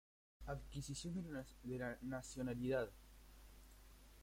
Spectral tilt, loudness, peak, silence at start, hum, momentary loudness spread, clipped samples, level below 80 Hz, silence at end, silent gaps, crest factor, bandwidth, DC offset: -5.5 dB/octave; -47 LUFS; -30 dBFS; 0.4 s; none; 22 LU; under 0.1%; -60 dBFS; 0 s; none; 18 dB; 16.5 kHz; under 0.1%